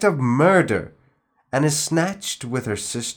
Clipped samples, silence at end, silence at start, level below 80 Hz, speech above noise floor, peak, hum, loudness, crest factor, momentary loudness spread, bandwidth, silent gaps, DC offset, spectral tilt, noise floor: under 0.1%; 0.05 s; 0 s; -58 dBFS; 43 dB; -2 dBFS; none; -21 LUFS; 18 dB; 11 LU; over 20 kHz; none; under 0.1%; -4.5 dB/octave; -63 dBFS